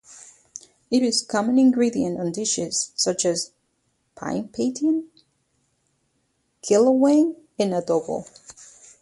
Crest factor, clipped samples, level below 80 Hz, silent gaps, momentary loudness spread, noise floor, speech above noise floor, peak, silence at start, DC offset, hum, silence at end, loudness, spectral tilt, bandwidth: 18 dB; under 0.1%; -64 dBFS; none; 21 LU; -70 dBFS; 49 dB; -6 dBFS; 0.1 s; under 0.1%; none; 0.35 s; -22 LUFS; -4 dB/octave; 11.5 kHz